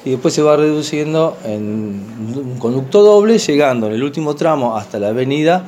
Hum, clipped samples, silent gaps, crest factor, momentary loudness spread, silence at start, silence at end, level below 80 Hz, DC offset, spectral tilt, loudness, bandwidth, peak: none; under 0.1%; none; 14 dB; 13 LU; 0 s; 0 s; -62 dBFS; under 0.1%; -6 dB/octave; -14 LUFS; 13.5 kHz; 0 dBFS